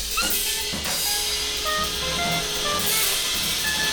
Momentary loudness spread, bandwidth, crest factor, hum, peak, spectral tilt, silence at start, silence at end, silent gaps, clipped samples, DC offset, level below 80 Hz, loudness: 4 LU; over 20 kHz; 14 dB; none; -10 dBFS; -0.5 dB/octave; 0 s; 0 s; none; under 0.1%; under 0.1%; -42 dBFS; -22 LUFS